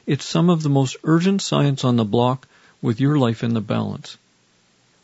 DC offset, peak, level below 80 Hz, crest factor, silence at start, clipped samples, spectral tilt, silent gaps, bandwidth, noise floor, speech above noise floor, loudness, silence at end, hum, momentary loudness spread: under 0.1%; -4 dBFS; -62 dBFS; 16 dB; 0.05 s; under 0.1%; -6.5 dB/octave; none; 8 kHz; -60 dBFS; 41 dB; -20 LUFS; 0.9 s; none; 10 LU